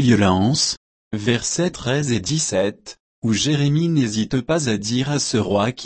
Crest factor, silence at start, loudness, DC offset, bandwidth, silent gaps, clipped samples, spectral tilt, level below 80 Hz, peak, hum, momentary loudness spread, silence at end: 16 dB; 0 s; -20 LUFS; under 0.1%; 8.8 kHz; 0.77-1.11 s, 3.00-3.22 s; under 0.1%; -4.5 dB/octave; -50 dBFS; -4 dBFS; none; 8 LU; 0 s